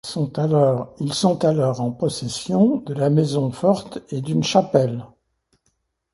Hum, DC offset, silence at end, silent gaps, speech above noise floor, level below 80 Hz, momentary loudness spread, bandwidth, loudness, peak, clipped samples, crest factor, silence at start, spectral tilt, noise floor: none; under 0.1%; 1.1 s; none; 50 dB; -58 dBFS; 8 LU; 11.5 kHz; -20 LUFS; -2 dBFS; under 0.1%; 18 dB; 0.05 s; -6.5 dB/octave; -70 dBFS